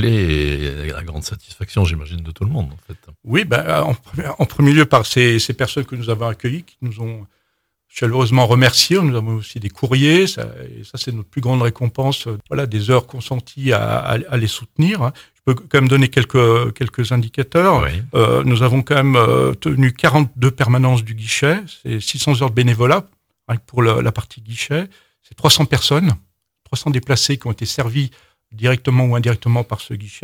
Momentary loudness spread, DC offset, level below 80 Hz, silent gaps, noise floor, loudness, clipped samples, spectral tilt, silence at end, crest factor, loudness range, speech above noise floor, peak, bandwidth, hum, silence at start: 14 LU; under 0.1%; -38 dBFS; none; -70 dBFS; -16 LUFS; under 0.1%; -5.5 dB/octave; 0.05 s; 16 dB; 5 LU; 53 dB; 0 dBFS; 16.5 kHz; none; 0 s